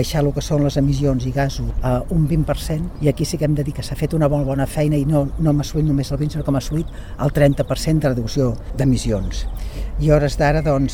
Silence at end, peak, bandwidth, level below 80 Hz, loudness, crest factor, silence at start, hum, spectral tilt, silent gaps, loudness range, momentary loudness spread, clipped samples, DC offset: 0 s; -2 dBFS; 16.5 kHz; -28 dBFS; -20 LUFS; 16 dB; 0 s; none; -7 dB/octave; none; 1 LU; 7 LU; under 0.1%; under 0.1%